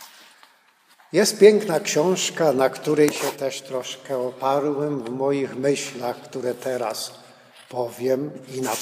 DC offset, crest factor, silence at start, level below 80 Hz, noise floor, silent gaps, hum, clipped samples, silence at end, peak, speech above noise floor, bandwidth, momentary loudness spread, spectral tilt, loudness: under 0.1%; 22 dB; 0 s; -72 dBFS; -58 dBFS; none; none; under 0.1%; 0 s; -2 dBFS; 36 dB; 15.5 kHz; 12 LU; -4 dB/octave; -22 LUFS